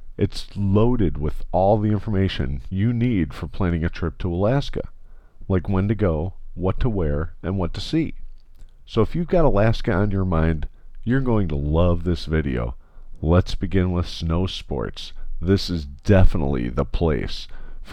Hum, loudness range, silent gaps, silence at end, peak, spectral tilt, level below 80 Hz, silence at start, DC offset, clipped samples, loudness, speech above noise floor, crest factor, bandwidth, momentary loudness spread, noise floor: none; 3 LU; none; 0 s; -4 dBFS; -8 dB/octave; -28 dBFS; 0 s; under 0.1%; under 0.1%; -23 LUFS; 21 dB; 18 dB; 8.8 kHz; 10 LU; -41 dBFS